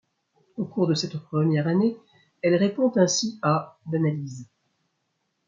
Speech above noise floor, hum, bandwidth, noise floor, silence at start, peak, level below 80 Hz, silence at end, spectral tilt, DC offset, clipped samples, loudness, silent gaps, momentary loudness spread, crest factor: 52 dB; none; 7.6 kHz; -76 dBFS; 0.55 s; -6 dBFS; -72 dBFS; 1.05 s; -5.5 dB/octave; under 0.1%; under 0.1%; -24 LUFS; none; 13 LU; 18 dB